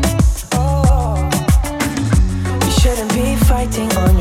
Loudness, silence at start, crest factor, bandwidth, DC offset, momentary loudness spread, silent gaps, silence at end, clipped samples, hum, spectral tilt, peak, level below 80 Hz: -16 LUFS; 0 s; 12 dB; 16.5 kHz; under 0.1%; 4 LU; none; 0 s; under 0.1%; none; -5.5 dB/octave; -2 dBFS; -16 dBFS